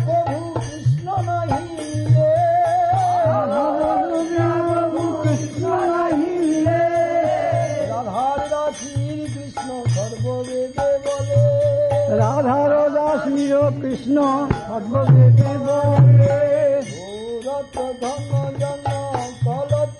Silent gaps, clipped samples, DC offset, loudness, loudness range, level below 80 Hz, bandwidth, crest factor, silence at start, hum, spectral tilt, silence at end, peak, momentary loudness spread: none; under 0.1%; under 0.1%; -19 LUFS; 7 LU; -46 dBFS; 10.5 kHz; 16 dB; 0 s; none; -7.5 dB/octave; 0 s; -4 dBFS; 10 LU